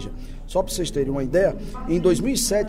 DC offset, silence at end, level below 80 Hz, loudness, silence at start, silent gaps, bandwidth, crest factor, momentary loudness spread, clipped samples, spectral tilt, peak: under 0.1%; 0 s; -34 dBFS; -23 LUFS; 0 s; none; 16 kHz; 14 dB; 12 LU; under 0.1%; -4.5 dB/octave; -8 dBFS